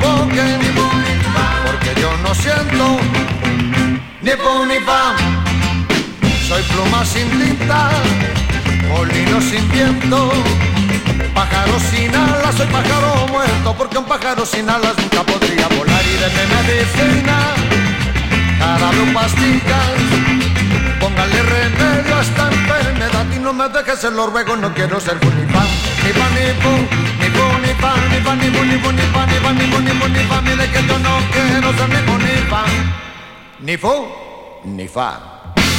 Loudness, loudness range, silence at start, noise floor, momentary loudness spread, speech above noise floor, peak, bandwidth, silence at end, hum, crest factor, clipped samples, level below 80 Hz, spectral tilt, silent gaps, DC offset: -14 LUFS; 2 LU; 0 s; -35 dBFS; 4 LU; 21 dB; 0 dBFS; 16.5 kHz; 0 s; none; 14 dB; under 0.1%; -26 dBFS; -5 dB/octave; none; under 0.1%